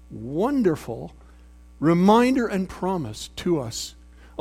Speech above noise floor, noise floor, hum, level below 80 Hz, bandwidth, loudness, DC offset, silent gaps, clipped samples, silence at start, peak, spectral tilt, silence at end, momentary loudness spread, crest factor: 26 dB; -48 dBFS; none; -48 dBFS; 15.5 kHz; -23 LUFS; under 0.1%; none; under 0.1%; 0.1 s; -4 dBFS; -6 dB/octave; 0 s; 18 LU; 18 dB